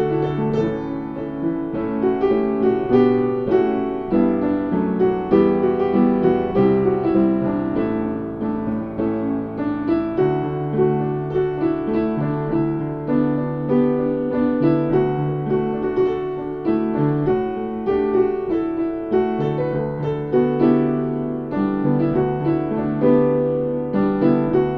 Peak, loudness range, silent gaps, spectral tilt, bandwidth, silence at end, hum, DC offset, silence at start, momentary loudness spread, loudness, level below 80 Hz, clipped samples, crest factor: -4 dBFS; 3 LU; none; -10.5 dB/octave; 5.2 kHz; 0 s; none; 0.2%; 0 s; 7 LU; -20 LUFS; -46 dBFS; under 0.1%; 16 dB